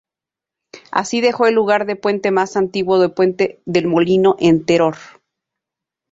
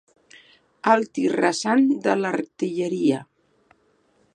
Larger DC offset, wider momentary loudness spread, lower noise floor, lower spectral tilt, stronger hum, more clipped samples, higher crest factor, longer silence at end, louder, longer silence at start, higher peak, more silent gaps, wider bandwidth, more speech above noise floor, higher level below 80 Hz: neither; about the same, 6 LU vs 7 LU; first, -87 dBFS vs -63 dBFS; about the same, -5.5 dB/octave vs -5 dB/octave; neither; neither; about the same, 16 dB vs 20 dB; about the same, 1.05 s vs 1.1 s; first, -16 LUFS vs -22 LUFS; about the same, 0.75 s vs 0.85 s; about the same, -2 dBFS vs -2 dBFS; neither; second, 7.8 kHz vs 11 kHz; first, 72 dB vs 42 dB; first, -56 dBFS vs -76 dBFS